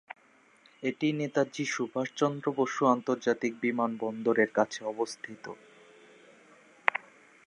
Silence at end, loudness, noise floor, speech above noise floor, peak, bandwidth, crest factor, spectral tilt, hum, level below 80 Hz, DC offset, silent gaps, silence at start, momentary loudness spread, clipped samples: 0.45 s; -30 LUFS; -62 dBFS; 32 dB; -2 dBFS; 11 kHz; 30 dB; -5 dB/octave; none; -82 dBFS; under 0.1%; none; 0.8 s; 15 LU; under 0.1%